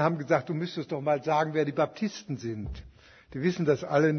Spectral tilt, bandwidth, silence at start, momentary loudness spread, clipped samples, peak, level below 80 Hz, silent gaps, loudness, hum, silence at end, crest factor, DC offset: -7 dB/octave; 6.6 kHz; 0 s; 11 LU; under 0.1%; -10 dBFS; -52 dBFS; none; -29 LUFS; none; 0 s; 18 dB; under 0.1%